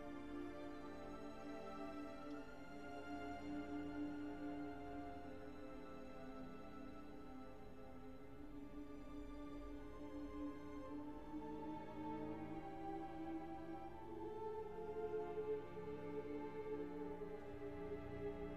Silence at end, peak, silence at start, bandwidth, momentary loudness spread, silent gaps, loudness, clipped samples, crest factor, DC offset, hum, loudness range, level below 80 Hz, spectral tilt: 0 s; -36 dBFS; 0 s; 14.5 kHz; 8 LU; none; -51 LUFS; under 0.1%; 14 dB; 0.1%; none; 7 LU; -64 dBFS; -7.5 dB/octave